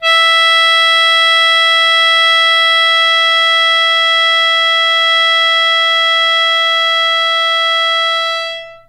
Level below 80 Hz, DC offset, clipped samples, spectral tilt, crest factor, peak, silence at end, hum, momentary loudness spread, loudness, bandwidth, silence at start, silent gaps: -62 dBFS; under 0.1%; under 0.1%; 4 dB/octave; 10 dB; 0 dBFS; 0.1 s; none; 3 LU; -9 LUFS; 16 kHz; 0 s; none